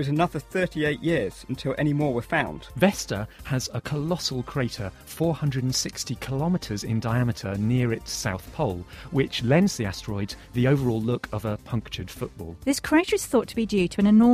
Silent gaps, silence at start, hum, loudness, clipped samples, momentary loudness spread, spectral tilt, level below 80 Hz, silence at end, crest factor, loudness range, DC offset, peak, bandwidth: none; 0 s; none; -26 LUFS; under 0.1%; 10 LU; -5.5 dB/octave; -46 dBFS; 0 s; 20 dB; 2 LU; under 0.1%; -6 dBFS; 15.5 kHz